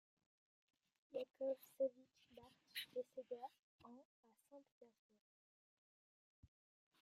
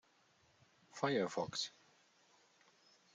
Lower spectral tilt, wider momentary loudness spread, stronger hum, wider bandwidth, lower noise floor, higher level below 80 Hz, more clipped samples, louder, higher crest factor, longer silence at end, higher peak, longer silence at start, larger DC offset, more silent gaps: about the same, -3.5 dB/octave vs -4 dB/octave; first, 21 LU vs 9 LU; neither; first, 15 kHz vs 9.6 kHz; second, -67 dBFS vs -73 dBFS; about the same, -90 dBFS vs -86 dBFS; neither; second, -49 LUFS vs -40 LUFS; about the same, 22 dB vs 22 dB; first, 2.15 s vs 1.45 s; second, -32 dBFS vs -22 dBFS; first, 1.1 s vs 0.95 s; neither; first, 3.62-3.79 s, 4.05-4.23 s, 4.71-4.81 s vs none